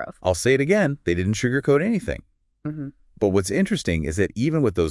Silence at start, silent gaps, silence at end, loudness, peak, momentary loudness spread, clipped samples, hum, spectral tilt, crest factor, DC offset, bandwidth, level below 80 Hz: 0 s; none; 0 s; -22 LUFS; -6 dBFS; 13 LU; under 0.1%; none; -6 dB/octave; 16 dB; under 0.1%; 12 kHz; -46 dBFS